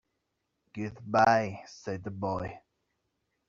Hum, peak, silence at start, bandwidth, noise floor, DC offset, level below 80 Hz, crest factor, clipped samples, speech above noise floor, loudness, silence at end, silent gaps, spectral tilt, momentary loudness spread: none; -10 dBFS; 0.75 s; 7.6 kHz; -81 dBFS; under 0.1%; -62 dBFS; 24 dB; under 0.1%; 52 dB; -30 LUFS; 0.9 s; none; -5 dB/octave; 18 LU